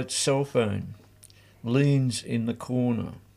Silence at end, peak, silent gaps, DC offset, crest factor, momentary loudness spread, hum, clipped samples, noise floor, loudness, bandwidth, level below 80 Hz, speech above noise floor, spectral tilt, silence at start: 0.15 s; -12 dBFS; none; under 0.1%; 16 dB; 10 LU; 50 Hz at -50 dBFS; under 0.1%; -54 dBFS; -26 LUFS; 14.5 kHz; -60 dBFS; 28 dB; -5.5 dB/octave; 0 s